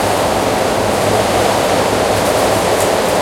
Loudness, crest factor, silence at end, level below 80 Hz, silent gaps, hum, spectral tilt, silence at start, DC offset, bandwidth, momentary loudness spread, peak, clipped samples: -14 LUFS; 12 dB; 0 s; -36 dBFS; none; none; -4 dB/octave; 0 s; under 0.1%; 16.5 kHz; 1 LU; 0 dBFS; under 0.1%